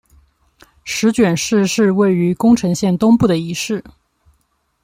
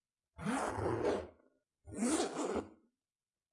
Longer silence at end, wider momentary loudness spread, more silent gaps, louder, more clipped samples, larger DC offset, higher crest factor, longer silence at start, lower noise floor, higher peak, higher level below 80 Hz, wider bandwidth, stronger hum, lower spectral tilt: first, 0.95 s vs 0.8 s; second, 10 LU vs 14 LU; neither; first, -15 LUFS vs -38 LUFS; neither; neither; second, 14 dB vs 20 dB; first, 0.85 s vs 0.4 s; second, -64 dBFS vs under -90 dBFS; first, -2 dBFS vs -20 dBFS; first, -48 dBFS vs -64 dBFS; first, 16 kHz vs 11.5 kHz; neither; about the same, -5.5 dB/octave vs -4.5 dB/octave